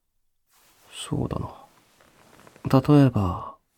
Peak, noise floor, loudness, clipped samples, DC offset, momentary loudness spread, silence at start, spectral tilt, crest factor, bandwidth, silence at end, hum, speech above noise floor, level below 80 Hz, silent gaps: -6 dBFS; -71 dBFS; -23 LUFS; under 0.1%; under 0.1%; 20 LU; 0.95 s; -7.5 dB/octave; 20 dB; 14.5 kHz; 0.25 s; none; 50 dB; -48 dBFS; none